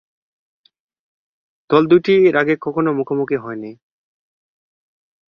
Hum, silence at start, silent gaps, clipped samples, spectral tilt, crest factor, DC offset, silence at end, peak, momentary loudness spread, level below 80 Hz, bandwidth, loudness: none; 1.7 s; none; under 0.1%; -8.5 dB/octave; 18 dB; under 0.1%; 1.55 s; -2 dBFS; 15 LU; -62 dBFS; 6 kHz; -16 LUFS